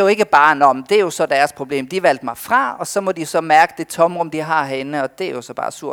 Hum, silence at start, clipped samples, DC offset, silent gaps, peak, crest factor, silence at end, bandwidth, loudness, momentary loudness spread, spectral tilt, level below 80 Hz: none; 0 s; under 0.1%; under 0.1%; none; 0 dBFS; 16 dB; 0 s; 18.5 kHz; -17 LUFS; 11 LU; -4 dB/octave; -62 dBFS